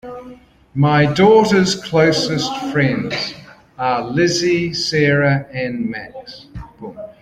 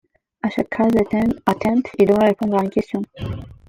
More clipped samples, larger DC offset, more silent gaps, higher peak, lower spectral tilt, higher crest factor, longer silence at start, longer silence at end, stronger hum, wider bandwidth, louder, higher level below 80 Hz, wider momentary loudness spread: neither; neither; neither; about the same, -2 dBFS vs -2 dBFS; second, -5.5 dB/octave vs -7.5 dB/octave; about the same, 16 dB vs 18 dB; second, 0.05 s vs 0.45 s; about the same, 0.1 s vs 0.2 s; neither; second, 13.5 kHz vs 16 kHz; first, -16 LUFS vs -19 LUFS; about the same, -48 dBFS vs -46 dBFS; first, 21 LU vs 11 LU